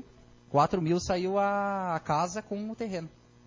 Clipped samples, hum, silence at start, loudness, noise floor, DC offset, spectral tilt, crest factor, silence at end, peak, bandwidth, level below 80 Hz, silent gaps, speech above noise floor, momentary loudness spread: under 0.1%; 60 Hz at -60 dBFS; 0.5 s; -30 LUFS; -55 dBFS; under 0.1%; -6 dB/octave; 18 dB; 0.4 s; -12 dBFS; 7.6 kHz; -56 dBFS; none; 27 dB; 10 LU